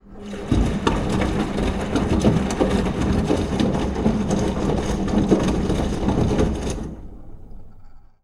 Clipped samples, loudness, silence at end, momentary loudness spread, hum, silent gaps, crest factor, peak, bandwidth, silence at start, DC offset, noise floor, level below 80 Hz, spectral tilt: under 0.1%; -22 LUFS; 0.25 s; 8 LU; none; none; 20 dB; -2 dBFS; 13 kHz; 0.05 s; under 0.1%; -41 dBFS; -30 dBFS; -6.5 dB/octave